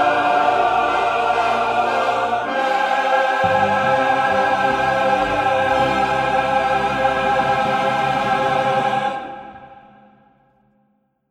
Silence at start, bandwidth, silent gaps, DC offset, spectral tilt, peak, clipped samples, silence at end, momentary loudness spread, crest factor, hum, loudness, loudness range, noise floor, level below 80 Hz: 0 s; 14 kHz; none; under 0.1%; -4.5 dB/octave; -4 dBFS; under 0.1%; 1.5 s; 3 LU; 14 dB; none; -18 LUFS; 4 LU; -64 dBFS; -48 dBFS